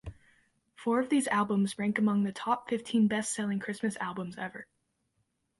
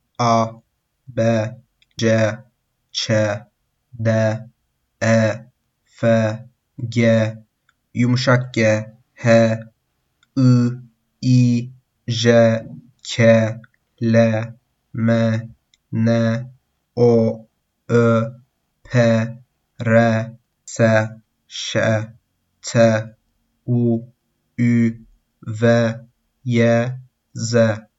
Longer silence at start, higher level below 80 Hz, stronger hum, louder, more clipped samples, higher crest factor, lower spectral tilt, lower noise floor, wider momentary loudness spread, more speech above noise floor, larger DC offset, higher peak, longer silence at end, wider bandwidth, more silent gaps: second, 0.05 s vs 0.2 s; about the same, -62 dBFS vs -60 dBFS; neither; second, -31 LUFS vs -18 LUFS; neither; about the same, 18 dB vs 18 dB; second, -5 dB/octave vs -6.5 dB/octave; first, -78 dBFS vs -69 dBFS; second, 11 LU vs 18 LU; second, 48 dB vs 53 dB; neither; second, -14 dBFS vs 0 dBFS; first, 0.95 s vs 0.2 s; first, 11.5 kHz vs 8 kHz; neither